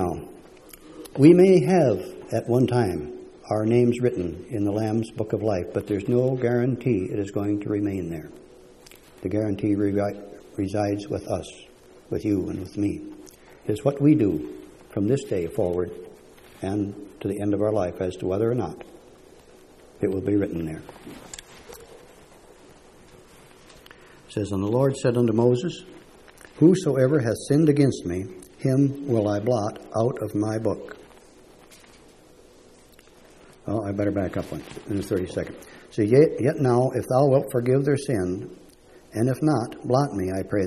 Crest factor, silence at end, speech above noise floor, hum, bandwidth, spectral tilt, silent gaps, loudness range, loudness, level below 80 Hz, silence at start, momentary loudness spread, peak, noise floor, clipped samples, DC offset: 22 dB; 0 s; 29 dB; none; 13.5 kHz; -7.5 dB/octave; none; 9 LU; -24 LUFS; -54 dBFS; 0 s; 17 LU; -2 dBFS; -52 dBFS; under 0.1%; under 0.1%